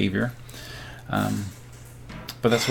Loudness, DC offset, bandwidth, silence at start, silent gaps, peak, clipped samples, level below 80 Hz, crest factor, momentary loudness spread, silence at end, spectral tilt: -28 LUFS; under 0.1%; 17.5 kHz; 0 s; none; -8 dBFS; under 0.1%; -50 dBFS; 20 dB; 19 LU; 0 s; -5 dB/octave